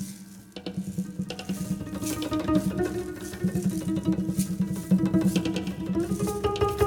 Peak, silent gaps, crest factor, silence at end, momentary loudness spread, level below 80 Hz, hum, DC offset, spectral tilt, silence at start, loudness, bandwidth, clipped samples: -10 dBFS; none; 18 dB; 0 s; 10 LU; -46 dBFS; none; under 0.1%; -6.5 dB/octave; 0 s; -28 LUFS; 18 kHz; under 0.1%